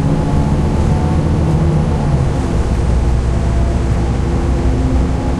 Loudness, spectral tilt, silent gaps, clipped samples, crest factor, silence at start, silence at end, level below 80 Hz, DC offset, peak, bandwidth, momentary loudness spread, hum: -15 LUFS; -8 dB/octave; none; under 0.1%; 12 dB; 0 s; 0 s; -16 dBFS; under 0.1%; -2 dBFS; 11 kHz; 2 LU; none